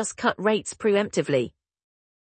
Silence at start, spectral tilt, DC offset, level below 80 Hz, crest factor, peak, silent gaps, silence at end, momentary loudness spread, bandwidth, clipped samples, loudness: 0 s; -4.5 dB/octave; under 0.1%; -66 dBFS; 20 dB; -6 dBFS; none; 0.9 s; 3 LU; 8.8 kHz; under 0.1%; -24 LUFS